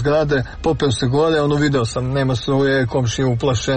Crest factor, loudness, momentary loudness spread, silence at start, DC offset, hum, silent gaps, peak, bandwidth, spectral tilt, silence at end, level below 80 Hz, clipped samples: 10 dB; -18 LUFS; 3 LU; 0 s; 0.4%; none; none; -6 dBFS; 8.8 kHz; -6 dB/octave; 0 s; -36 dBFS; under 0.1%